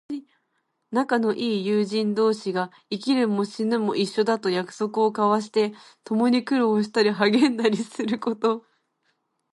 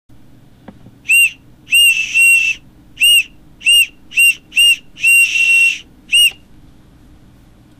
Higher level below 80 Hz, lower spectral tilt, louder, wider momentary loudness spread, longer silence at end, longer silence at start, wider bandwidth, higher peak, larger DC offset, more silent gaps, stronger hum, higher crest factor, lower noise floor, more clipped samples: second, -74 dBFS vs -50 dBFS; first, -5.5 dB/octave vs 3 dB/octave; second, -23 LUFS vs -9 LUFS; about the same, 8 LU vs 8 LU; second, 0.95 s vs 1.5 s; second, 0.1 s vs 1.1 s; second, 11.5 kHz vs 15.5 kHz; about the same, -6 dBFS vs -6 dBFS; neither; neither; neither; first, 18 dB vs 10 dB; first, -74 dBFS vs -44 dBFS; neither